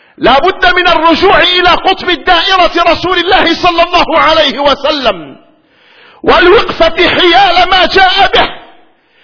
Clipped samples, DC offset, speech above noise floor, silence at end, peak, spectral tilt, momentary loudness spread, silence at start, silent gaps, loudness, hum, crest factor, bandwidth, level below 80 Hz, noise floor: 1%; under 0.1%; 38 dB; 0.6 s; 0 dBFS; -4 dB/octave; 5 LU; 0.2 s; none; -7 LUFS; none; 8 dB; 5.4 kHz; -28 dBFS; -45 dBFS